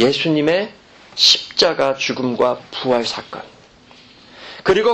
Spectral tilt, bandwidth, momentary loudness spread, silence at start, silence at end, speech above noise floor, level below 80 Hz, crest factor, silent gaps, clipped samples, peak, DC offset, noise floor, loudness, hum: -3.5 dB/octave; 13 kHz; 20 LU; 0 s; 0 s; 29 dB; -54 dBFS; 18 dB; none; under 0.1%; 0 dBFS; under 0.1%; -46 dBFS; -16 LUFS; none